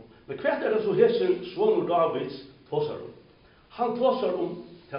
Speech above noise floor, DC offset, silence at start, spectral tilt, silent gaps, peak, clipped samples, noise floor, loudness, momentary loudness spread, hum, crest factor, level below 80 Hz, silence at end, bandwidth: 31 dB; under 0.1%; 0 s; -4.5 dB/octave; none; -8 dBFS; under 0.1%; -56 dBFS; -26 LUFS; 18 LU; none; 20 dB; -66 dBFS; 0 s; 5.4 kHz